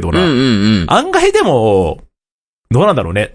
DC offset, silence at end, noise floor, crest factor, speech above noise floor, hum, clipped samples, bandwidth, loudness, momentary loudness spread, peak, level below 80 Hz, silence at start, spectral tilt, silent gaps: under 0.1%; 0.05 s; under -90 dBFS; 12 dB; over 79 dB; none; under 0.1%; 10.5 kHz; -12 LUFS; 5 LU; 0 dBFS; -32 dBFS; 0 s; -6 dB/octave; 2.31-2.64 s